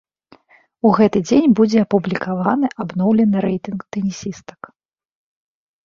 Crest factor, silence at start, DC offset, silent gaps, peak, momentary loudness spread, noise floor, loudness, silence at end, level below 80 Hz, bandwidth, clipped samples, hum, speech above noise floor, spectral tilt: 16 dB; 0.85 s; under 0.1%; none; -2 dBFS; 13 LU; -53 dBFS; -17 LUFS; 1.45 s; -54 dBFS; 7.4 kHz; under 0.1%; none; 37 dB; -7 dB/octave